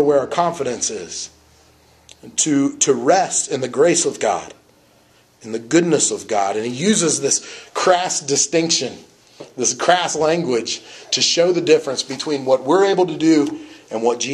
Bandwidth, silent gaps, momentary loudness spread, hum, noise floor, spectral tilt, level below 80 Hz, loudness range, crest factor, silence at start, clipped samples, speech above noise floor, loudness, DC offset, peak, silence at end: 12 kHz; none; 11 LU; none; -54 dBFS; -3 dB/octave; -62 dBFS; 2 LU; 18 dB; 0 s; under 0.1%; 36 dB; -17 LUFS; under 0.1%; 0 dBFS; 0 s